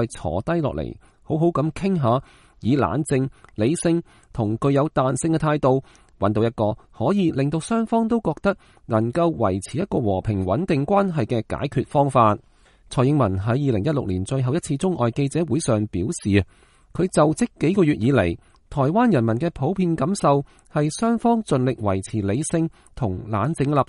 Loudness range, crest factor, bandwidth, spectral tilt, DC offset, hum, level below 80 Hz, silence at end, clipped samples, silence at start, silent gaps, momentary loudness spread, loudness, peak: 2 LU; 18 dB; 11.5 kHz; -7 dB/octave; under 0.1%; none; -46 dBFS; 0.05 s; under 0.1%; 0 s; none; 7 LU; -22 LUFS; -4 dBFS